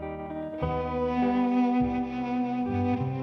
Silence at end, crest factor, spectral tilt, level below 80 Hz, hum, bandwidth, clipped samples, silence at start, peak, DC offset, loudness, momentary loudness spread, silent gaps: 0 s; 12 dB; -9 dB/octave; -46 dBFS; none; 6 kHz; under 0.1%; 0 s; -16 dBFS; under 0.1%; -28 LUFS; 8 LU; none